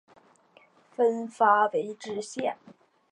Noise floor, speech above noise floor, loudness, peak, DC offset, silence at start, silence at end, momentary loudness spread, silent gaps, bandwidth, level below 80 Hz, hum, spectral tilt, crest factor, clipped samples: -60 dBFS; 34 dB; -27 LUFS; -8 dBFS; under 0.1%; 1 s; 0.6 s; 15 LU; none; 10.5 kHz; -82 dBFS; none; -4 dB/octave; 20 dB; under 0.1%